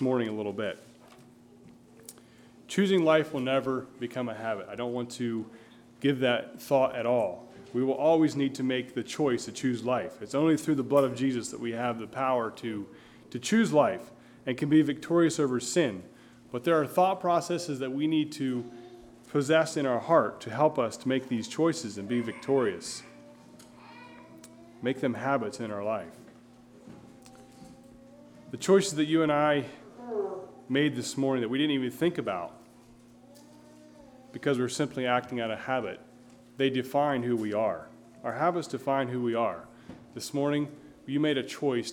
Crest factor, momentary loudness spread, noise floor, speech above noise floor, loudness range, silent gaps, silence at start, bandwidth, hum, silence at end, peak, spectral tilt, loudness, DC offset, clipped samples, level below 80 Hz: 20 dB; 15 LU; -55 dBFS; 27 dB; 6 LU; none; 0 s; 17 kHz; none; 0 s; -8 dBFS; -5.5 dB/octave; -29 LUFS; under 0.1%; under 0.1%; -70 dBFS